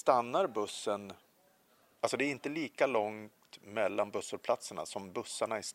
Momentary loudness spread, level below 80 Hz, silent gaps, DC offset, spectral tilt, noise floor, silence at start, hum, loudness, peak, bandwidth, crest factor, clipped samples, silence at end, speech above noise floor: 10 LU; -82 dBFS; none; under 0.1%; -3.5 dB/octave; -69 dBFS; 0.05 s; none; -35 LUFS; -12 dBFS; 16 kHz; 24 dB; under 0.1%; 0 s; 34 dB